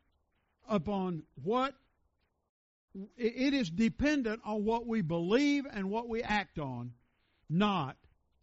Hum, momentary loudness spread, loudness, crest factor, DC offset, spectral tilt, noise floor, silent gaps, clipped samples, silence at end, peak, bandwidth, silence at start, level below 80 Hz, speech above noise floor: none; 11 LU; -33 LUFS; 18 dB; under 0.1%; -5 dB/octave; -77 dBFS; 2.49-2.88 s; under 0.1%; 0.5 s; -16 dBFS; 7.6 kHz; 0.7 s; -58 dBFS; 45 dB